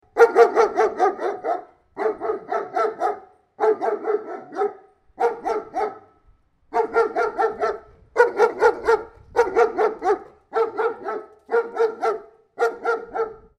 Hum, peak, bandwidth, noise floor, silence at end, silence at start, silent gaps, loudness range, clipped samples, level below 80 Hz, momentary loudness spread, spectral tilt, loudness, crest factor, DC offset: none; 0 dBFS; 9.8 kHz; -58 dBFS; 0.2 s; 0.15 s; none; 5 LU; under 0.1%; -58 dBFS; 11 LU; -4 dB/octave; -22 LUFS; 22 dB; under 0.1%